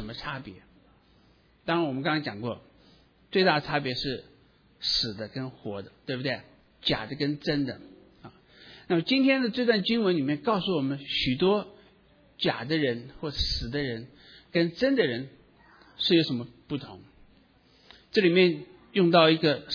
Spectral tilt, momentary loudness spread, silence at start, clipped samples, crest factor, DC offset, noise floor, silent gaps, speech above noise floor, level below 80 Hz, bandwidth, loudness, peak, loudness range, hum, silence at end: -6.5 dB/octave; 14 LU; 0 s; under 0.1%; 22 dB; under 0.1%; -61 dBFS; none; 35 dB; -52 dBFS; 5.4 kHz; -27 LUFS; -6 dBFS; 6 LU; none; 0 s